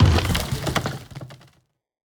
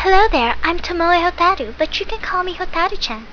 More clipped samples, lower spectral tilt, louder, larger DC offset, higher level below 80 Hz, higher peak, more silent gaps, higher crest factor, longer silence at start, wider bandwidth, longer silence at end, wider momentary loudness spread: neither; about the same, -5 dB/octave vs -4 dB/octave; second, -23 LUFS vs -17 LUFS; neither; about the same, -32 dBFS vs -30 dBFS; second, -4 dBFS vs 0 dBFS; neither; about the same, 18 dB vs 16 dB; about the same, 0 s vs 0 s; first, over 20 kHz vs 5.4 kHz; first, 0.75 s vs 0 s; first, 20 LU vs 8 LU